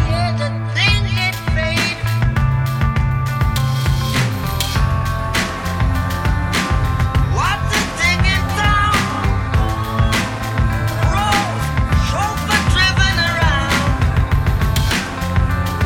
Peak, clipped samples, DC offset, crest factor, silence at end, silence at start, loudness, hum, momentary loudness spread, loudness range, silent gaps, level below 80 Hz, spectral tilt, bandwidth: -2 dBFS; under 0.1%; under 0.1%; 14 dB; 0 s; 0 s; -17 LUFS; none; 5 LU; 3 LU; none; -22 dBFS; -4.5 dB/octave; 18 kHz